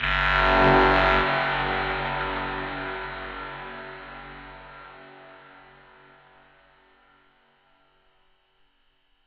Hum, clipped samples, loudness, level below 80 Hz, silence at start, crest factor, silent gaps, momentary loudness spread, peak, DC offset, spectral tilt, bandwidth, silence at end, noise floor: none; under 0.1%; -23 LUFS; -40 dBFS; 0 s; 20 dB; none; 25 LU; -6 dBFS; under 0.1%; -6.5 dB/octave; 7.4 kHz; 3.9 s; -65 dBFS